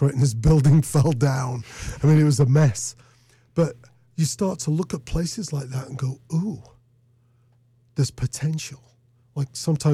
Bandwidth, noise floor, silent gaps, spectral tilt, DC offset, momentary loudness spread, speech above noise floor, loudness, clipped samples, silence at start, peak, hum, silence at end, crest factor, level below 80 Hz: 13.5 kHz; -60 dBFS; none; -6.5 dB/octave; under 0.1%; 14 LU; 39 dB; -22 LUFS; under 0.1%; 0 s; -10 dBFS; none; 0 s; 12 dB; -40 dBFS